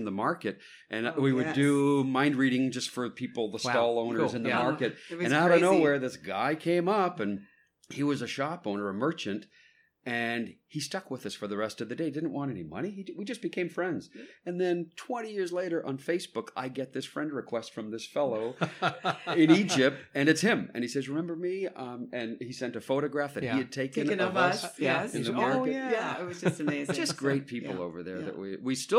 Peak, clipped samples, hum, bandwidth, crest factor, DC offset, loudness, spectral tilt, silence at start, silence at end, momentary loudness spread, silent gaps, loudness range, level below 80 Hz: -8 dBFS; under 0.1%; none; 15.5 kHz; 22 dB; under 0.1%; -30 LUFS; -5 dB/octave; 0 s; 0 s; 12 LU; none; 8 LU; -76 dBFS